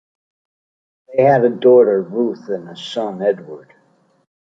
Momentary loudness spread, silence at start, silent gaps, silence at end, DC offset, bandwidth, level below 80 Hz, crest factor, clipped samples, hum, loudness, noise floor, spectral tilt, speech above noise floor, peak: 15 LU; 1.1 s; none; 0.9 s; under 0.1%; 7.6 kHz; -68 dBFS; 16 dB; under 0.1%; none; -16 LUFS; -58 dBFS; -7 dB/octave; 42 dB; -2 dBFS